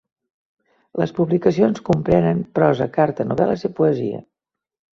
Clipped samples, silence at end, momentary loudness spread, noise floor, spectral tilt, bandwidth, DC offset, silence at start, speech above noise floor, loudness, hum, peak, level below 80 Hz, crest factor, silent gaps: under 0.1%; 0.75 s; 7 LU; -85 dBFS; -8.5 dB/octave; 7.2 kHz; under 0.1%; 0.95 s; 67 dB; -19 LUFS; none; -2 dBFS; -50 dBFS; 18 dB; none